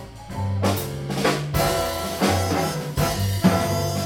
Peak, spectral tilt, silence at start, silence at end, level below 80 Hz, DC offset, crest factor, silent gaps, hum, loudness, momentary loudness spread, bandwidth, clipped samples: -6 dBFS; -5 dB/octave; 0 s; 0 s; -40 dBFS; under 0.1%; 18 dB; none; none; -23 LUFS; 7 LU; 19 kHz; under 0.1%